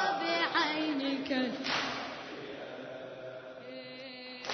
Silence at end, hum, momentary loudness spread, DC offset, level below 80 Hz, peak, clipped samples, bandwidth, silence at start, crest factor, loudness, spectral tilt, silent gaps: 0 s; none; 16 LU; under 0.1%; -74 dBFS; -16 dBFS; under 0.1%; 6.4 kHz; 0 s; 20 dB; -34 LUFS; -1 dB/octave; none